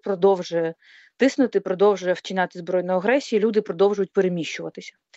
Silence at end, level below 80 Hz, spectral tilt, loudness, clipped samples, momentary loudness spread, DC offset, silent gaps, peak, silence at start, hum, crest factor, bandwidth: 0.25 s; -74 dBFS; -5.5 dB/octave; -22 LUFS; under 0.1%; 9 LU; under 0.1%; none; -6 dBFS; 0.05 s; none; 16 dB; 8 kHz